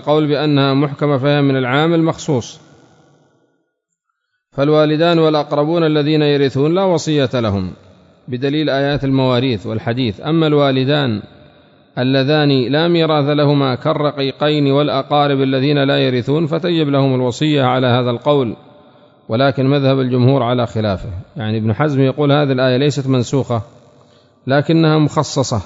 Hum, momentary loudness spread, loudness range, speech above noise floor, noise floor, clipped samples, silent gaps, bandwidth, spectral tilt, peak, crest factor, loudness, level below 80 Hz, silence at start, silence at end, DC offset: none; 7 LU; 3 LU; 58 dB; -72 dBFS; under 0.1%; none; 7.8 kHz; -6.5 dB/octave; 0 dBFS; 14 dB; -15 LUFS; -50 dBFS; 0 s; 0 s; under 0.1%